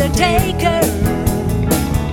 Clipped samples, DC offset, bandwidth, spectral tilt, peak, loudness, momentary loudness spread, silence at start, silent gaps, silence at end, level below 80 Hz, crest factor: under 0.1%; under 0.1%; 17.5 kHz; -5.5 dB/octave; -2 dBFS; -16 LUFS; 4 LU; 0 s; none; 0 s; -24 dBFS; 14 dB